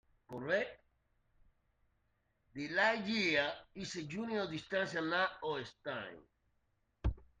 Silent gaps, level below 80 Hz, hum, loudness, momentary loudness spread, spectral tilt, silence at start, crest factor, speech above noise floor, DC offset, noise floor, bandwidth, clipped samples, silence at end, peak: none; -54 dBFS; none; -37 LUFS; 14 LU; -4.5 dB/octave; 0.3 s; 22 dB; 42 dB; under 0.1%; -79 dBFS; 9.6 kHz; under 0.1%; 0.15 s; -18 dBFS